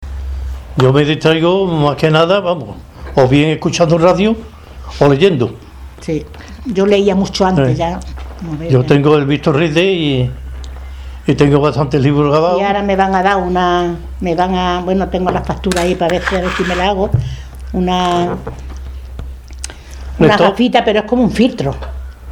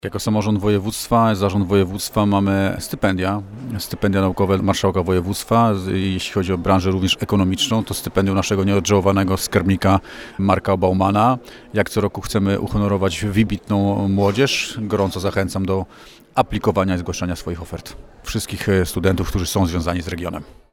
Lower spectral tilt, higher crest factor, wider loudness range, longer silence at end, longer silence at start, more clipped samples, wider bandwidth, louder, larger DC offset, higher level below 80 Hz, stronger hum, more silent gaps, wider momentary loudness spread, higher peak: about the same, -6.5 dB/octave vs -5.5 dB/octave; about the same, 14 dB vs 18 dB; about the same, 3 LU vs 4 LU; second, 0 s vs 0.3 s; about the same, 0 s vs 0.05 s; neither; second, 14 kHz vs 17 kHz; first, -13 LUFS vs -19 LUFS; neither; first, -30 dBFS vs -38 dBFS; neither; neither; first, 18 LU vs 9 LU; about the same, 0 dBFS vs -2 dBFS